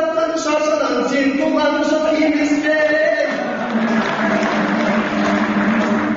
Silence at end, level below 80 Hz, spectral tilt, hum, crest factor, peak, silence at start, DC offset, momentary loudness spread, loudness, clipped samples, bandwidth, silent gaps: 0 s; -52 dBFS; -3.5 dB/octave; none; 10 dB; -6 dBFS; 0 s; under 0.1%; 3 LU; -17 LUFS; under 0.1%; 8 kHz; none